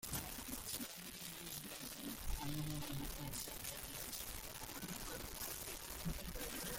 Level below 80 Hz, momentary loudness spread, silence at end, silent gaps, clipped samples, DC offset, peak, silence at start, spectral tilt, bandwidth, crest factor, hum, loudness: -54 dBFS; 4 LU; 0 s; none; under 0.1%; under 0.1%; -30 dBFS; 0 s; -3 dB/octave; 17 kHz; 18 dB; none; -46 LUFS